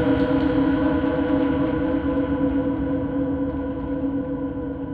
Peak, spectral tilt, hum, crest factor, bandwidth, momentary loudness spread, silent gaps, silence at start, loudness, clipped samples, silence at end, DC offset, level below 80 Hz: -8 dBFS; -10.5 dB/octave; none; 14 dB; 4.7 kHz; 7 LU; none; 0 s; -23 LUFS; under 0.1%; 0 s; under 0.1%; -38 dBFS